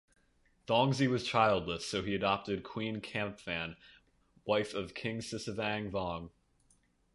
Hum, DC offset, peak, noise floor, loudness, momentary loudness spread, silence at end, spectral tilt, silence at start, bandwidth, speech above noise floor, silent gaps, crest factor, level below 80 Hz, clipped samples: none; under 0.1%; -12 dBFS; -71 dBFS; -34 LUFS; 11 LU; 0.85 s; -5 dB/octave; 0.7 s; 11.5 kHz; 37 dB; none; 22 dB; -60 dBFS; under 0.1%